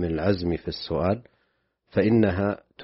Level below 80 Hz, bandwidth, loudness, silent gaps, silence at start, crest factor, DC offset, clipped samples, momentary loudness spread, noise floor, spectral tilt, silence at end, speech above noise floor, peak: -46 dBFS; 6 kHz; -25 LUFS; none; 0 s; 18 dB; under 0.1%; under 0.1%; 9 LU; -72 dBFS; -6.5 dB/octave; 0 s; 48 dB; -6 dBFS